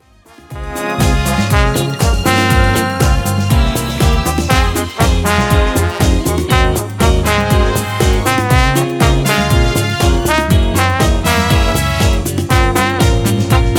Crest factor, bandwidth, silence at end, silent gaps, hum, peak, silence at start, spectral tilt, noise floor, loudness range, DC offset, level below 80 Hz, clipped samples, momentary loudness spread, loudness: 12 dB; 18.5 kHz; 0 s; none; none; 0 dBFS; 0.5 s; -5 dB/octave; -42 dBFS; 1 LU; under 0.1%; -18 dBFS; under 0.1%; 3 LU; -13 LUFS